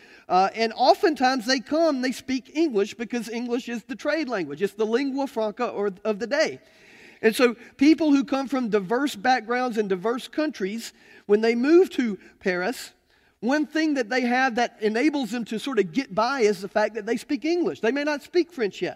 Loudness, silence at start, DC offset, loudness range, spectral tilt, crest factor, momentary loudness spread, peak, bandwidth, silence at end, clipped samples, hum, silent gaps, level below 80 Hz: -24 LUFS; 0.3 s; under 0.1%; 4 LU; -4.5 dB/octave; 18 dB; 9 LU; -6 dBFS; 15.5 kHz; 0 s; under 0.1%; none; none; -68 dBFS